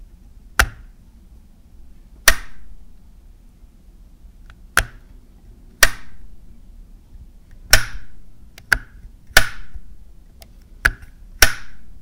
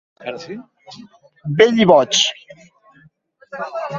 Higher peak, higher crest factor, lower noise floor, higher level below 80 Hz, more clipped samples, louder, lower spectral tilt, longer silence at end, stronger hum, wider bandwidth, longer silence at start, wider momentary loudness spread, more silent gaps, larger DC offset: about the same, 0 dBFS vs 0 dBFS; about the same, 22 dB vs 20 dB; second, -45 dBFS vs -53 dBFS; first, -32 dBFS vs -60 dBFS; neither; second, -18 LUFS vs -15 LUFS; second, -1 dB/octave vs -3.5 dB/octave; about the same, 0 s vs 0 s; neither; first, 16 kHz vs 8 kHz; second, 0 s vs 0.2 s; second, 19 LU vs 23 LU; neither; neither